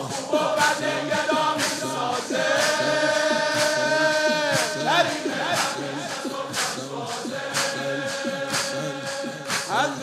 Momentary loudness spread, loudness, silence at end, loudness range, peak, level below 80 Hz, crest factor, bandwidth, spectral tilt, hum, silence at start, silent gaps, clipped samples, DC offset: 9 LU; -23 LUFS; 0 s; 6 LU; -4 dBFS; -72 dBFS; 20 dB; 16 kHz; -2.5 dB/octave; none; 0 s; none; under 0.1%; under 0.1%